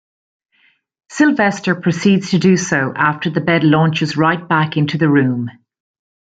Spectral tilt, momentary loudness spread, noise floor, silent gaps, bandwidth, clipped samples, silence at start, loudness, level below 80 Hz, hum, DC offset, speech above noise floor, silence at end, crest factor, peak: -6 dB/octave; 5 LU; -58 dBFS; none; 9 kHz; under 0.1%; 1.1 s; -15 LUFS; -56 dBFS; none; under 0.1%; 44 dB; 0.9 s; 14 dB; -2 dBFS